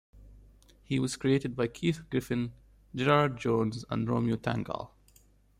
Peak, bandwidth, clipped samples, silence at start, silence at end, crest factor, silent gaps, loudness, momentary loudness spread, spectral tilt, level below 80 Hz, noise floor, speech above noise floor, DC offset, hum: -10 dBFS; 15.5 kHz; under 0.1%; 0.15 s; 0.7 s; 22 dB; none; -30 LUFS; 12 LU; -6.5 dB/octave; -58 dBFS; -62 dBFS; 33 dB; under 0.1%; 50 Hz at -60 dBFS